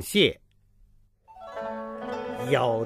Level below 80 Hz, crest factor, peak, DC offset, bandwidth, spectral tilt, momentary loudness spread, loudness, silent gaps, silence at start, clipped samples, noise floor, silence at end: -58 dBFS; 22 dB; -8 dBFS; under 0.1%; 15.5 kHz; -4.5 dB/octave; 20 LU; -27 LUFS; none; 0 s; under 0.1%; -59 dBFS; 0 s